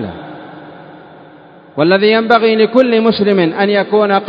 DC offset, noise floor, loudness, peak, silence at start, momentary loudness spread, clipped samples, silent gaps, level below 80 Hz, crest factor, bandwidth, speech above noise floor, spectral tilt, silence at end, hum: under 0.1%; -39 dBFS; -11 LUFS; 0 dBFS; 0 s; 20 LU; 0.1%; none; -54 dBFS; 12 dB; 5.2 kHz; 28 dB; -8 dB/octave; 0 s; none